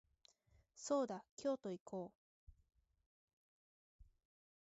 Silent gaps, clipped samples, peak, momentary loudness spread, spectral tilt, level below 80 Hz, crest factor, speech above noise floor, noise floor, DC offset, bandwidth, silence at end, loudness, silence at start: 1.31-1.37 s, 1.81-1.86 s, 2.15-2.47 s, 3.06-3.99 s; under 0.1%; -28 dBFS; 11 LU; -5.5 dB/octave; -76 dBFS; 20 dB; 32 dB; -75 dBFS; under 0.1%; 7.6 kHz; 0.65 s; -45 LUFS; 0.75 s